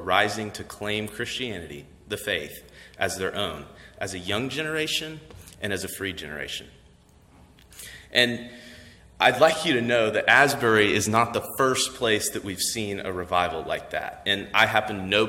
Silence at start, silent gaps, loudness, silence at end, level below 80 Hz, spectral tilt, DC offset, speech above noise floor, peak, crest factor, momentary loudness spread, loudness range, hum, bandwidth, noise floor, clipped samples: 0 s; none; -24 LUFS; 0 s; -56 dBFS; -3 dB/octave; under 0.1%; 30 dB; -2 dBFS; 24 dB; 16 LU; 10 LU; none; 16.5 kHz; -55 dBFS; under 0.1%